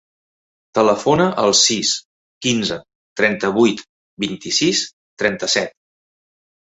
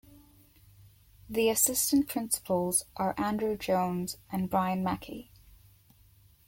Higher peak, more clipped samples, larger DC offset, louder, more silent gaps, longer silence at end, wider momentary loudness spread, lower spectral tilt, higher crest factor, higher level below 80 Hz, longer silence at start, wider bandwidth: first, 0 dBFS vs -12 dBFS; neither; neither; first, -17 LUFS vs -29 LUFS; first, 2.05-2.41 s, 2.95-3.16 s, 3.89-4.17 s, 4.93-5.17 s vs none; second, 1.05 s vs 1.25 s; about the same, 12 LU vs 11 LU; about the same, -3 dB/octave vs -4 dB/octave; about the same, 20 dB vs 20 dB; about the same, -56 dBFS vs -60 dBFS; first, 0.75 s vs 0.15 s; second, 8.4 kHz vs 17 kHz